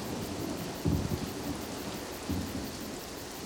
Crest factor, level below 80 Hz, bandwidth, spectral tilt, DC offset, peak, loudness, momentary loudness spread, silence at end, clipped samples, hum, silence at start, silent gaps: 18 dB; -48 dBFS; over 20 kHz; -5 dB/octave; under 0.1%; -18 dBFS; -36 LUFS; 7 LU; 0 s; under 0.1%; none; 0 s; none